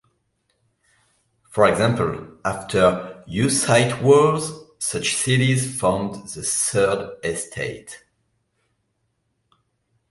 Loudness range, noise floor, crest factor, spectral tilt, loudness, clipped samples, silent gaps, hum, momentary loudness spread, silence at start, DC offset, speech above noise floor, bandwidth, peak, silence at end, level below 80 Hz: 7 LU; -72 dBFS; 20 dB; -4.5 dB/octave; -20 LUFS; under 0.1%; none; none; 14 LU; 1.5 s; under 0.1%; 52 dB; 12 kHz; -2 dBFS; 2.15 s; -52 dBFS